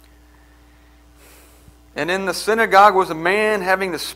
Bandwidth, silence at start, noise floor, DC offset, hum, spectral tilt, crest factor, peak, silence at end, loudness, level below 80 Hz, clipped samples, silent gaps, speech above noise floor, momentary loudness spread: 16 kHz; 1.95 s; -49 dBFS; under 0.1%; none; -3.5 dB/octave; 20 dB; 0 dBFS; 0 s; -16 LUFS; -50 dBFS; under 0.1%; none; 32 dB; 11 LU